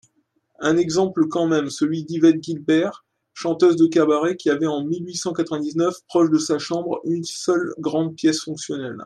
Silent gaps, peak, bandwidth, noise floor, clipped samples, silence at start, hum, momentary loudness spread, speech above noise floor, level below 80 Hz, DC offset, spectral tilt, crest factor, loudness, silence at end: none; -4 dBFS; 11.5 kHz; -66 dBFS; under 0.1%; 0.6 s; none; 8 LU; 46 dB; -68 dBFS; under 0.1%; -5 dB/octave; 18 dB; -21 LUFS; 0 s